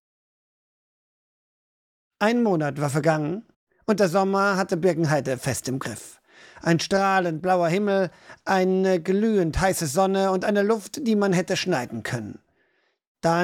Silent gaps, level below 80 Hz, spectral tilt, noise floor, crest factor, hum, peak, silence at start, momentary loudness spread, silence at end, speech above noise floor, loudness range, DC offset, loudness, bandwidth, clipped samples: 3.56-3.67 s, 13.07-13.15 s; -48 dBFS; -5.5 dB/octave; -68 dBFS; 16 dB; none; -8 dBFS; 2.2 s; 9 LU; 0 s; 46 dB; 3 LU; under 0.1%; -23 LUFS; 17 kHz; under 0.1%